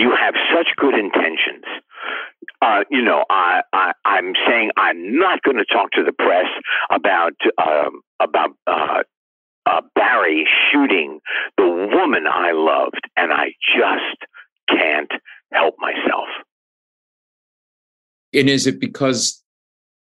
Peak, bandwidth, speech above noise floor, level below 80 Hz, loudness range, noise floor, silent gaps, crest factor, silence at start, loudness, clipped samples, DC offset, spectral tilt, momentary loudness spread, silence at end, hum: 0 dBFS; 12.5 kHz; over 73 dB; -72 dBFS; 5 LU; under -90 dBFS; 8.07-8.19 s, 9.17-9.62 s, 14.52-14.56 s, 14.63-14.67 s, 16.52-18.32 s; 18 dB; 0 s; -17 LUFS; under 0.1%; under 0.1%; -3 dB/octave; 9 LU; 0.75 s; none